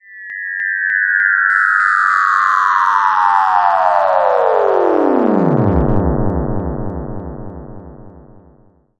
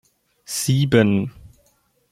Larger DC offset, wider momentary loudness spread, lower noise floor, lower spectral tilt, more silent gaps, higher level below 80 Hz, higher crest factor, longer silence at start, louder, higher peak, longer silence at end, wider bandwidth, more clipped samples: neither; about the same, 14 LU vs 12 LU; second, -50 dBFS vs -63 dBFS; first, -7.5 dB/octave vs -5.5 dB/octave; neither; first, -30 dBFS vs -50 dBFS; second, 14 dB vs 20 dB; second, 0.1 s vs 0.5 s; first, -13 LUFS vs -19 LUFS; about the same, 0 dBFS vs -2 dBFS; first, 0.8 s vs 0.65 s; second, 11 kHz vs 16 kHz; neither